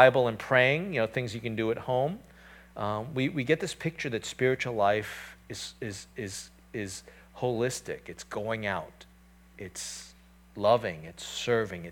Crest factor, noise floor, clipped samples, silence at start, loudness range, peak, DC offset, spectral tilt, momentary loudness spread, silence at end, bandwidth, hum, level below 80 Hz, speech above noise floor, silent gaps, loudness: 24 dB; -57 dBFS; under 0.1%; 0 s; 6 LU; -6 dBFS; under 0.1%; -4.5 dB/octave; 16 LU; 0 s; 18 kHz; none; -60 dBFS; 27 dB; none; -30 LUFS